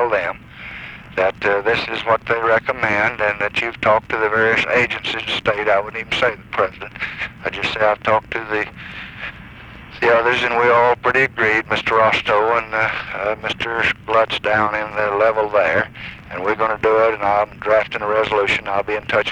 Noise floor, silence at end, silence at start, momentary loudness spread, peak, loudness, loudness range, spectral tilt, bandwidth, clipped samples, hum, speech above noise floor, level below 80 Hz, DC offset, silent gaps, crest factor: -38 dBFS; 0 s; 0 s; 12 LU; -4 dBFS; -18 LUFS; 4 LU; -4.5 dB/octave; 10 kHz; under 0.1%; none; 20 dB; -46 dBFS; under 0.1%; none; 16 dB